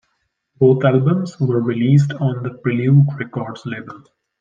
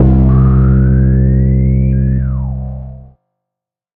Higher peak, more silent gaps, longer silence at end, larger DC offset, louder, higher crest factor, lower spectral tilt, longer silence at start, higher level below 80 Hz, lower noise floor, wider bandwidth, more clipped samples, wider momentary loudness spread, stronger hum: about the same, -2 dBFS vs -2 dBFS; neither; second, 0.45 s vs 0.9 s; neither; second, -17 LUFS vs -11 LUFS; first, 16 dB vs 10 dB; second, -9 dB/octave vs -13.5 dB/octave; first, 0.6 s vs 0 s; second, -62 dBFS vs -16 dBFS; second, -70 dBFS vs -83 dBFS; first, 7.2 kHz vs 2.5 kHz; neither; about the same, 14 LU vs 14 LU; neither